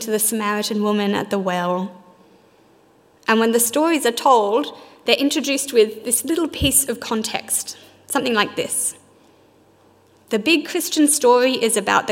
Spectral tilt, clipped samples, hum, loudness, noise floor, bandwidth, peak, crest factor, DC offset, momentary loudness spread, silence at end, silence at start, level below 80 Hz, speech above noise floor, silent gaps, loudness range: -2.5 dB/octave; under 0.1%; none; -18 LUFS; -54 dBFS; 16.5 kHz; 0 dBFS; 20 dB; under 0.1%; 8 LU; 0 s; 0 s; -48 dBFS; 35 dB; none; 5 LU